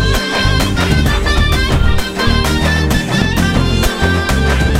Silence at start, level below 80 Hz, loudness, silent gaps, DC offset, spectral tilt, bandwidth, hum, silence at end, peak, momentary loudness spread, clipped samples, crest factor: 0 s; -18 dBFS; -13 LUFS; none; 0.6%; -5 dB/octave; 16.5 kHz; none; 0 s; 0 dBFS; 1 LU; under 0.1%; 12 dB